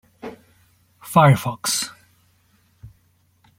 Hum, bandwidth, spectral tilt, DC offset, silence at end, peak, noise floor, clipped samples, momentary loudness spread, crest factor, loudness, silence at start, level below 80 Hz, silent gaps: none; 16.5 kHz; -5 dB/octave; under 0.1%; 0.7 s; 0 dBFS; -61 dBFS; under 0.1%; 24 LU; 22 dB; -19 LUFS; 0.25 s; -56 dBFS; none